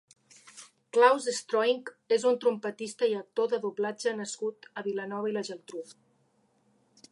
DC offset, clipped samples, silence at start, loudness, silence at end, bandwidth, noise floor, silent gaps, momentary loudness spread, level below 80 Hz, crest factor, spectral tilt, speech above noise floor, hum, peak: under 0.1%; under 0.1%; 0.45 s; -29 LUFS; 1.2 s; 11.5 kHz; -70 dBFS; none; 19 LU; -88 dBFS; 22 dB; -3.5 dB/octave; 41 dB; none; -8 dBFS